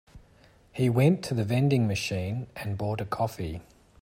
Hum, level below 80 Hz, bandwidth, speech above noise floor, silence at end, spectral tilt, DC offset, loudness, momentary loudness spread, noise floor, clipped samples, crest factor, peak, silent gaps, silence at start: none; -54 dBFS; 16 kHz; 31 dB; 0.4 s; -7 dB/octave; under 0.1%; -28 LUFS; 13 LU; -58 dBFS; under 0.1%; 18 dB; -10 dBFS; none; 0.15 s